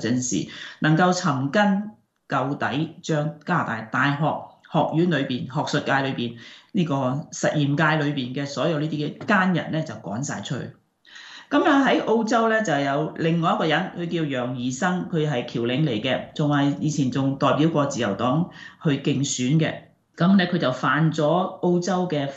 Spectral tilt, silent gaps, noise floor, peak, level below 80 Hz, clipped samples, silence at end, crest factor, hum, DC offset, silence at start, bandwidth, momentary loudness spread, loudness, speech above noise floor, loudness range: -5.5 dB/octave; none; -47 dBFS; -6 dBFS; -64 dBFS; under 0.1%; 0 s; 16 dB; none; under 0.1%; 0 s; 8.2 kHz; 9 LU; -23 LUFS; 24 dB; 3 LU